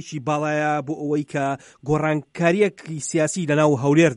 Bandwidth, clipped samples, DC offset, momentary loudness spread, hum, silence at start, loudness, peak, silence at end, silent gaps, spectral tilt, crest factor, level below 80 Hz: 11.5 kHz; under 0.1%; under 0.1%; 7 LU; none; 0 s; -22 LUFS; -4 dBFS; 0 s; none; -6 dB/octave; 16 dB; -56 dBFS